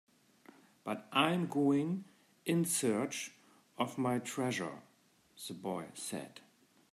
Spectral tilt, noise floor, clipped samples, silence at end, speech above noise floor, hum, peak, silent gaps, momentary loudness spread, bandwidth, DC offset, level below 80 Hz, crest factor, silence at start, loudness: -4.5 dB/octave; -69 dBFS; under 0.1%; 0.55 s; 34 dB; none; -14 dBFS; none; 15 LU; 15 kHz; under 0.1%; -84 dBFS; 24 dB; 0.85 s; -36 LUFS